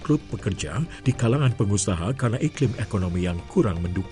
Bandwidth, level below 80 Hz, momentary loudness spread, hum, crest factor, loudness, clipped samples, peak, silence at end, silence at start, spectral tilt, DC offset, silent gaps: 11.5 kHz; -42 dBFS; 6 LU; none; 14 dB; -25 LUFS; under 0.1%; -10 dBFS; 0 s; 0 s; -6 dB/octave; under 0.1%; none